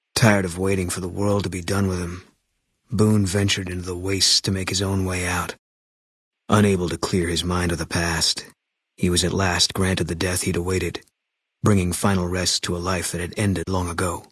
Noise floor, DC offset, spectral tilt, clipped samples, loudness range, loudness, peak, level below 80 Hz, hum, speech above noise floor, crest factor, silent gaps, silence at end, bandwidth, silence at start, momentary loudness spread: -80 dBFS; under 0.1%; -4 dB/octave; under 0.1%; 2 LU; -22 LUFS; -2 dBFS; -48 dBFS; none; 59 dB; 20 dB; 5.59-6.31 s; 0.1 s; 12 kHz; 0.15 s; 8 LU